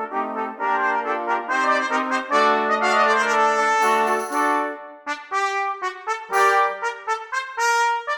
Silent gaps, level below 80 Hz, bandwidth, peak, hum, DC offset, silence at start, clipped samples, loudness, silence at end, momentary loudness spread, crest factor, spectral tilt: none; -76 dBFS; 19.5 kHz; -6 dBFS; none; under 0.1%; 0 s; under 0.1%; -21 LUFS; 0 s; 9 LU; 14 dB; -1.5 dB/octave